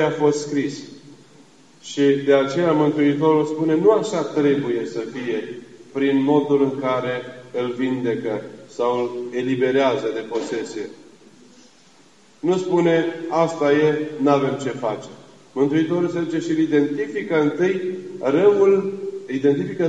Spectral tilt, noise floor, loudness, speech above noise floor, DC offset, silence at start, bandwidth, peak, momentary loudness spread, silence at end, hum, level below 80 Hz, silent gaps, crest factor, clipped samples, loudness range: -6.5 dB/octave; -53 dBFS; -20 LUFS; 33 dB; 0.2%; 0 s; 9 kHz; -4 dBFS; 12 LU; 0 s; none; -74 dBFS; none; 18 dB; under 0.1%; 5 LU